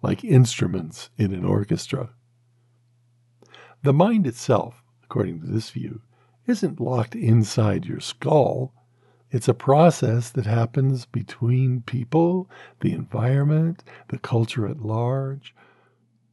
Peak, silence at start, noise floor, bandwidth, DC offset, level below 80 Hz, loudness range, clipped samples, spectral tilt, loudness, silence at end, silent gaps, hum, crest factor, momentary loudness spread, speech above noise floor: -2 dBFS; 0.05 s; -63 dBFS; 12 kHz; under 0.1%; -72 dBFS; 4 LU; under 0.1%; -7 dB/octave; -22 LUFS; 0.95 s; none; none; 20 dB; 15 LU; 42 dB